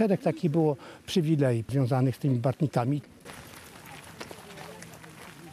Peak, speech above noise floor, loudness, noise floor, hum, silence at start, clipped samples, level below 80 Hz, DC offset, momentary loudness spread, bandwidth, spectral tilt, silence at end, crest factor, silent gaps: -12 dBFS; 20 dB; -27 LUFS; -47 dBFS; none; 0 s; under 0.1%; -66 dBFS; under 0.1%; 20 LU; 14.5 kHz; -7.5 dB/octave; 0 s; 18 dB; none